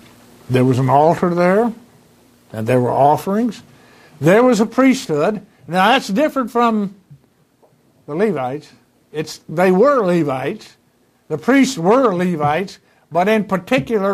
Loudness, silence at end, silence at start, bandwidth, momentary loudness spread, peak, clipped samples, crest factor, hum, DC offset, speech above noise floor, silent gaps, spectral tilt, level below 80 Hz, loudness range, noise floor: -16 LUFS; 0 s; 0.5 s; 15.5 kHz; 14 LU; 0 dBFS; under 0.1%; 16 dB; none; under 0.1%; 42 dB; none; -6.5 dB/octave; -58 dBFS; 4 LU; -57 dBFS